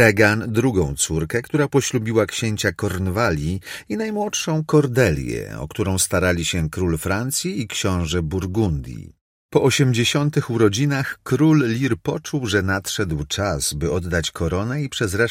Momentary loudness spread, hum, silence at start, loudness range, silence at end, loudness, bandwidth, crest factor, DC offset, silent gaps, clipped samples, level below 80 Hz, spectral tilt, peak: 8 LU; none; 0 s; 3 LU; 0 s; -21 LUFS; 16.5 kHz; 20 dB; under 0.1%; 9.21-9.49 s; under 0.1%; -40 dBFS; -5 dB/octave; 0 dBFS